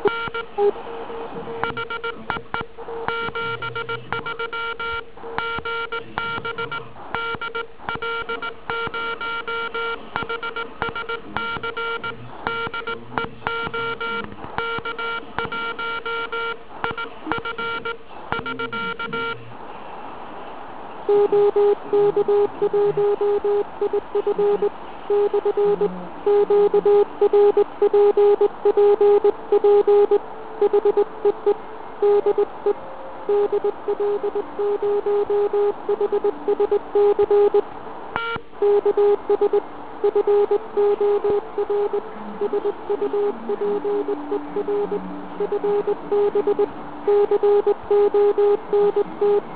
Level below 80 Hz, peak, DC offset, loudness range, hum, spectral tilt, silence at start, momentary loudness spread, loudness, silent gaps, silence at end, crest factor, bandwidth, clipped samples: -54 dBFS; -2 dBFS; 1%; 10 LU; none; -9 dB/octave; 0 s; 13 LU; -22 LUFS; none; 0 s; 18 dB; 4 kHz; under 0.1%